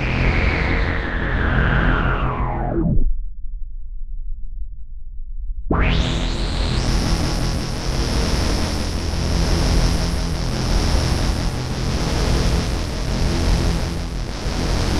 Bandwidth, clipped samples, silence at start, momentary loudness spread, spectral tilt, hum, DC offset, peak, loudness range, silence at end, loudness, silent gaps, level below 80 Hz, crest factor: 13.5 kHz; under 0.1%; 0 s; 17 LU; -5 dB/octave; none; 0.6%; -4 dBFS; 5 LU; 0 s; -21 LUFS; none; -22 dBFS; 16 dB